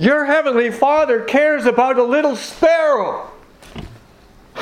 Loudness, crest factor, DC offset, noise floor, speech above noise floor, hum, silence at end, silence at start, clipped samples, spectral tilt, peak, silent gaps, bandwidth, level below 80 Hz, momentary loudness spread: -15 LUFS; 16 dB; under 0.1%; -46 dBFS; 31 dB; none; 0 s; 0 s; under 0.1%; -5 dB/octave; 0 dBFS; none; 14.5 kHz; -48 dBFS; 18 LU